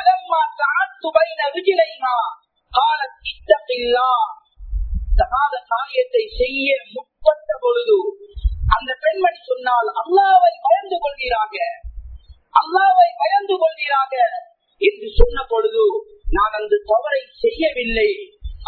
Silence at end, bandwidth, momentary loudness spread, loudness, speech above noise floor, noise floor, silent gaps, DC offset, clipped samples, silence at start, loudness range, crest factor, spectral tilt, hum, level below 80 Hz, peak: 0 s; 4.6 kHz; 11 LU; -18 LUFS; 21 dB; -39 dBFS; none; under 0.1%; under 0.1%; 0 s; 3 LU; 18 dB; -8 dB/octave; none; -28 dBFS; 0 dBFS